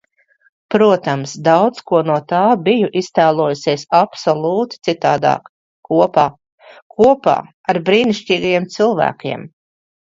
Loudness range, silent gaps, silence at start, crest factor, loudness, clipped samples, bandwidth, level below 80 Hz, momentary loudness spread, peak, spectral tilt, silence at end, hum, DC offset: 2 LU; 5.49-5.83 s, 6.52-6.58 s, 6.82-6.90 s, 7.54-7.64 s; 0.7 s; 16 dB; -15 LUFS; under 0.1%; 7.8 kHz; -56 dBFS; 7 LU; 0 dBFS; -6 dB/octave; 0.6 s; none; under 0.1%